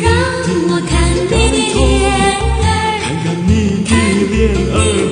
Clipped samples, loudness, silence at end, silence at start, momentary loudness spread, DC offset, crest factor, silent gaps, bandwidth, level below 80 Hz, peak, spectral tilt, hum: under 0.1%; -13 LUFS; 0 s; 0 s; 3 LU; under 0.1%; 12 dB; none; 10 kHz; -20 dBFS; 0 dBFS; -5 dB/octave; none